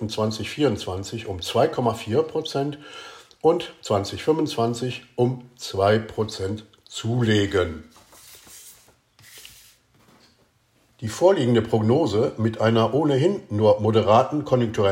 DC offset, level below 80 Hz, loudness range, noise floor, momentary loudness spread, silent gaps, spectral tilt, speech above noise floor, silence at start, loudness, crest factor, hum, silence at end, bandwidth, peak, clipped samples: under 0.1%; -56 dBFS; 7 LU; -63 dBFS; 17 LU; none; -6 dB/octave; 41 dB; 0 s; -22 LUFS; 18 dB; none; 0 s; 16 kHz; -4 dBFS; under 0.1%